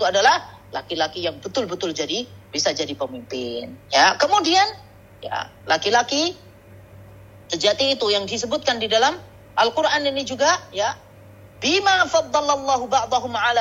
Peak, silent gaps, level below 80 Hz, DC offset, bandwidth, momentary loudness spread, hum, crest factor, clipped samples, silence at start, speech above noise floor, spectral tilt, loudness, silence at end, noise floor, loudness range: -4 dBFS; none; -56 dBFS; under 0.1%; 16 kHz; 13 LU; none; 18 dB; under 0.1%; 0 s; 24 dB; -2 dB/octave; -20 LUFS; 0 s; -45 dBFS; 3 LU